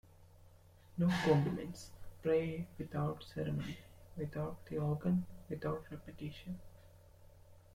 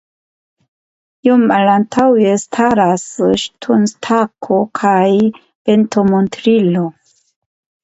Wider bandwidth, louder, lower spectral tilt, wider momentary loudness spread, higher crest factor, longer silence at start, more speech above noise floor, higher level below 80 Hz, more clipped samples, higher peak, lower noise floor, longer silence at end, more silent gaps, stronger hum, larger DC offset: first, 15.5 kHz vs 8.2 kHz; second, -39 LUFS vs -13 LUFS; first, -7.5 dB/octave vs -6 dB/octave; first, 16 LU vs 6 LU; first, 22 dB vs 14 dB; second, 0.2 s vs 1.25 s; second, 24 dB vs over 78 dB; second, -60 dBFS vs -54 dBFS; neither; second, -18 dBFS vs 0 dBFS; second, -61 dBFS vs under -90 dBFS; second, 0.15 s vs 0.9 s; second, none vs 5.55-5.65 s; neither; neither